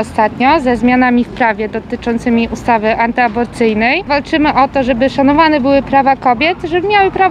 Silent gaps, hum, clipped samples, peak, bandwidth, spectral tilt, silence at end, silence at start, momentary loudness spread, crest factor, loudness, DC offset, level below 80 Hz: none; none; under 0.1%; 0 dBFS; 10.5 kHz; -6 dB/octave; 0 s; 0 s; 5 LU; 12 dB; -12 LUFS; under 0.1%; -36 dBFS